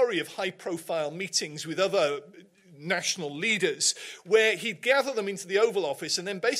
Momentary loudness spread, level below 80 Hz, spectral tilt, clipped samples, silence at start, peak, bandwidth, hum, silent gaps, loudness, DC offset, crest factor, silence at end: 9 LU; -82 dBFS; -2 dB/octave; under 0.1%; 0 s; -8 dBFS; 15.5 kHz; none; none; -27 LUFS; under 0.1%; 20 dB; 0 s